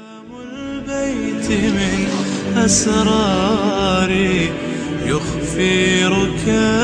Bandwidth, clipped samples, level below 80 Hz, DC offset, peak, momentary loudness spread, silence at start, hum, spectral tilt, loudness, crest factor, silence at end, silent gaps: 10.5 kHz; under 0.1%; -36 dBFS; under 0.1%; -2 dBFS; 10 LU; 0 s; none; -4.5 dB/octave; -17 LUFS; 14 dB; 0 s; none